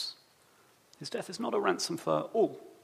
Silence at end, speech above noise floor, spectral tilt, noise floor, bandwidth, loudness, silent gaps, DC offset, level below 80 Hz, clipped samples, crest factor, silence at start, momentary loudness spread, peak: 0.1 s; 32 dB; -4 dB/octave; -64 dBFS; 15.5 kHz; -32 LUFS; none; under 0.1%; -84 dBFS; under 0.1%; 22 dB; 0 s; 10 LU; -12 dBFS